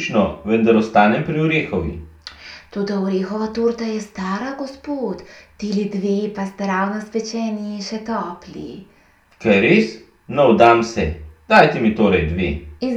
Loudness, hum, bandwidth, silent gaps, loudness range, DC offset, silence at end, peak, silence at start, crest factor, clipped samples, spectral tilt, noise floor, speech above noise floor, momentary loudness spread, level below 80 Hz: -18 LUFS; none; 8.4 kHz; none; 8 LU; under 0.1%; 0 s; 0 dBFS; 0 s; 18 dB; under 0.1%; -6.5 dB/octave; -53 dBFS; 35 dB; 17 LU; -40 dBFS